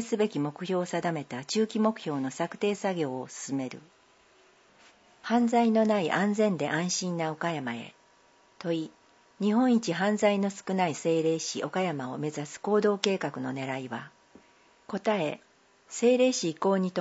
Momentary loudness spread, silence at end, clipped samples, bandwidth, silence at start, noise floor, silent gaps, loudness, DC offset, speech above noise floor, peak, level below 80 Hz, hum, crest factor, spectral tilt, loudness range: 11 LU; 0 s; under 0.1%; 8 kHz; 0 s; -62 dBFS; none; -29 LUFS; under 0.1%; 34 dB; -4 dBFS; -78 dBFS; none; 26 dB; -5 dB/octave; 4 LU